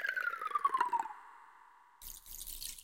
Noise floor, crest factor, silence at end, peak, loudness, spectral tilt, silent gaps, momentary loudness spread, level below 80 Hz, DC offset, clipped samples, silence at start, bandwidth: -62 dBFS; 22 dB; 0 s; -18 dBFS; -37 LUFS; 0 dB/octave; none; 20 LU; -60 dBFS; under 0.1%; under 0.1%; 0 s; 17 kHz